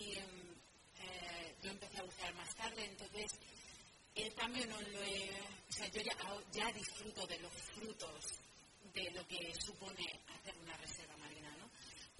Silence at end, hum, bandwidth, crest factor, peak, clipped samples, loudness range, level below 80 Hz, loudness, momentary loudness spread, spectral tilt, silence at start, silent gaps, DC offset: 0 s; none; 11.5 kHz; 22 dB; -26 dBFS; under 0.1%; 4 LU; -70 dBFS; -47 LUFS; 13 LU; -2 dB/octave; 0 s; none; under 0.1%